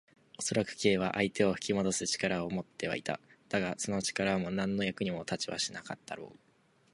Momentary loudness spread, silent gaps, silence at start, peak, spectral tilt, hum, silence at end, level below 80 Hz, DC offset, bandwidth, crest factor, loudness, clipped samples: 12 LU; none; 0.4 s; -12 dBFS; -4 dB/octave; none; 0.6 s; -64 dBFS; under 0.1%; 11.5 kHz; 22 dB; -33 LUFS; under 0.1%